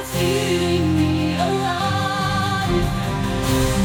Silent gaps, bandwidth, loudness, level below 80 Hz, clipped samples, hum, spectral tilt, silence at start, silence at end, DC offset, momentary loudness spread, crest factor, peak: none; 19 kHz; -20 LUFS; -32 dBFS; under 0.1%; none; -5.5 dB/octave; 0 s; 0 s; under 0.1%; 3 LU; 14 dB; -4 dBFS